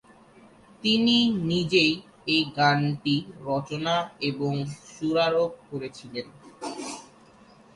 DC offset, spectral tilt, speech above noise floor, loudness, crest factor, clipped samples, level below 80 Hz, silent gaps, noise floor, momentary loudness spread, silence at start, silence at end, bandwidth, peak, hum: under 0.1%; -5 dB/octave; 28 dB; -25 LUFS; 20 dB; under 0.1%; -62 dBFS; none; -54 dBFS; 16 LU; 0.85 s; 0.7 s; 11.5 kHz; -8 dBFS; none